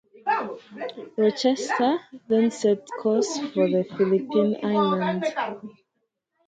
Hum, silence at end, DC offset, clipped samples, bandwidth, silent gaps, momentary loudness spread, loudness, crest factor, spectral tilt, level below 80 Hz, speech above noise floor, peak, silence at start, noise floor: none; 0.75 s; under 0.1%; under 0.1%; 9.2 kHz; none; 11 LU; -24 LUFS; 16 dB; -5.5 dB/octave; -72 dBFS; 54 dB; -8 dBFS; 0.25 s; -77 dBFS